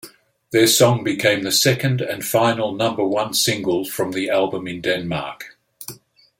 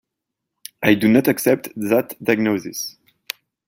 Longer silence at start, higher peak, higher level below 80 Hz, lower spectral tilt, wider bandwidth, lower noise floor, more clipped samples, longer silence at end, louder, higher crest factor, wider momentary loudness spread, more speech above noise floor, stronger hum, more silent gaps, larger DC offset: second, 0.05 s vs 0.8 s; about the same, -2 dBFS vs -2 dBFS; about the same, -58 dBFS vs -60 dBFS; second, -3.5 dB/octave vs -5 dB/octave; about the same, 17 kHz vs 17 kHz; second, -43 dBFS vs -81 dBFS; neither; second, 0.45 s vs 0.8 s; about the same, -19 LUFS vs -19 LUFS; about the same, 18 dB vs 18 dB; about the same, 18 LU vs 18 LU; second, 24 dB vs 63 dB; neither; neither; neither